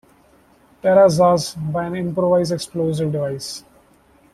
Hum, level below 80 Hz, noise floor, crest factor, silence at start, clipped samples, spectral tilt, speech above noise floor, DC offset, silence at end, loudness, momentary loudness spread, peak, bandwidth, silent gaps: none; -54 dBFS; -54 dBFS; 16 dB; 0.85 s; under 0.1%; -6 dB/octave; 36 dB; under 0.1%; 0.75 s; -18 LUFS; 12 LU; -2 dBFS; 14 kHz; none